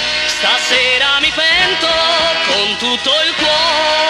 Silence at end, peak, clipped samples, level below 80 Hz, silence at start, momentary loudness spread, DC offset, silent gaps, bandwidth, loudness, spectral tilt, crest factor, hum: 0 s; -2 dBFS; under 0.1%; -44 dBFS; 0 s; 3 LU; under 0.1%; none; 14 kHz; -11 LUFS; -0.5 dB/octave; 12 dB; none